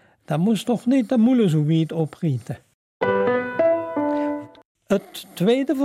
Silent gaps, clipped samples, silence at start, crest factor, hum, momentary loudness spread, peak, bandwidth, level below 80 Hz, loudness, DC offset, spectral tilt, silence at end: 2.74-3.00 s, 4.65-4.75 s; under 0.1%; 0.3 s; 14 dB; none; 10 LU; -8 dBFS; 15.5 kHz; -64 dBFS; -21 LUFS; under 0.1%; -7.5 dB/octave; 0 s